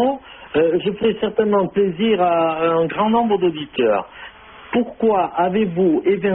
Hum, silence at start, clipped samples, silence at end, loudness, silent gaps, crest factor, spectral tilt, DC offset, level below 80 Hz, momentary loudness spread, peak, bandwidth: none; 0 s; under 0.1%; 0 s; -18 LUFS; none; 12 dB; -5 dB/octave; under 0.1%; -52 dBFS; 6 LU; -6 dBFS; 4 kHz